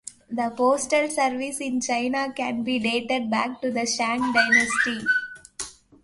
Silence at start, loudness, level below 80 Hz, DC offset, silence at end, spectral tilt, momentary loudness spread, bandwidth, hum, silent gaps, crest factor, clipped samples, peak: 0.05 s; -23 LUFS; -62 dBFS; under 0.1%; 0.3 s; -2.5 dB/octave; 12 LU; 11.5 kHz; none; none; 20 dB; under 0.1%; -4 dBFS